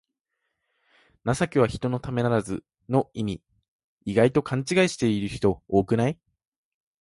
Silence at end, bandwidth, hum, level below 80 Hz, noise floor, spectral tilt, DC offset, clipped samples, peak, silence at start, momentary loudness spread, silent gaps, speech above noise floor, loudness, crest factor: 0.9 s; 11.5 kHz; none; -50 dBFS; -80 dBFS; -6.5 dB/octave; under 0.1%; under 0.1%; -6 dBFS; 1.25 s; 12 LU; 3.68-3.98 s; 56 dB; -25 LUFS; 20 dB